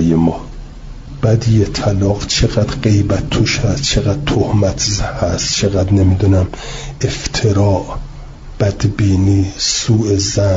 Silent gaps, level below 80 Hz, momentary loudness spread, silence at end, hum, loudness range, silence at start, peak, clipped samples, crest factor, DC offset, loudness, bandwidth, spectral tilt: none; -28 dBFS; 14 LU; 0 s; none; 2 LU; 0 s; -2 dBFS; under 0.1%; 12 dB; under 0.1%; -15 LUFS; 7.8 kHz; -5 dB/octave